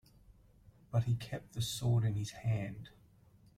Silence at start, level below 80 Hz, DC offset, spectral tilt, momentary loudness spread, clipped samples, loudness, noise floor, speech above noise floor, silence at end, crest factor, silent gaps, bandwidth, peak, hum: 0.3 s; -60 dBFS; under 0.1%; -5.5 dB/octave; 12 LU; under 0.1%; -36 LUFS; -64 dBFS; 29 dB; 0.7 s; 16 dB; none; 15 kHz; -20 dBFS; none